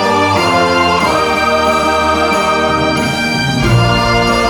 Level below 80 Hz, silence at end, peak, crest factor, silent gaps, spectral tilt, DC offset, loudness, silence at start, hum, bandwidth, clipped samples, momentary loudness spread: -30 dBFS; 0 s; 0 dBFS; 12 dB; none; -4.5 dB/octave; under 0.1%; -12 LUFS; 0 s; none; 19.5 kHz; under 0.1%; 3 LU